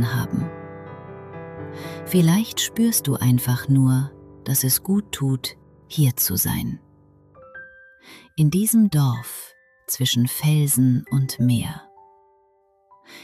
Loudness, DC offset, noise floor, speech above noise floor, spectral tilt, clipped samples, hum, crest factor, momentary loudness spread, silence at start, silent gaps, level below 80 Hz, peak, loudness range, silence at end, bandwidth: -21 LUFS; under 0.1%; -61 dBFS; 41 dB; -5 dB/octave; under 0.1%; none; 16 dB; 20 LU; 0 s; none; -54 dBFS; -6 dBFS; 3 LU; 0 s; 16 kHz